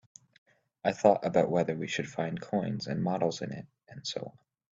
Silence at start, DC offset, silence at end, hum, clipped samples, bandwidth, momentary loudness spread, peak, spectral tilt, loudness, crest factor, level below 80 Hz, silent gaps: 0.85 s; under 0.1%; 0.4 s; none; under 0.1%; 7.8 kHz; 15 LU; -8 dBFS; -6 dB/octave; -31 LUFS; 24 dB; -68 dBFS; none